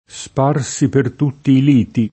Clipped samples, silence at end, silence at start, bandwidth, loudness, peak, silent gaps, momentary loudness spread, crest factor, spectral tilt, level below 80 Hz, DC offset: under 0.1%; 0.05 s; 0.15 s; 8.6 kHz; -16 LUFS; -2 dBFS; none; 7 LU; 14 dB; -6.5 dB/octave; -50 dBFS; under 0.1%